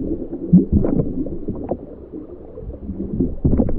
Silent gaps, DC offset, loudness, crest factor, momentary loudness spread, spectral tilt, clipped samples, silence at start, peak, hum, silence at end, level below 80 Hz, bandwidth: none; under 0.1%; -21 LUFS; 18 dB; 19 LU; -14.5 dB/octave; under 0.1%; 0 s; 0 dBFS; none; 0 s; -28 dBFS; 2.3 kHz